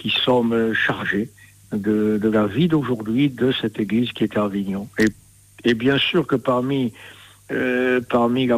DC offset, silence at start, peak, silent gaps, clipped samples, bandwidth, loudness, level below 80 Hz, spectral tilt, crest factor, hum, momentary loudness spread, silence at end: under 0.1%; 0 s; -8 dBFS; none; under 0.1%; 15.5 kHz; -20 LUFS; -54 dBFS; -6.5 dB/octave; 12 dB; none; 8 LU; 0 s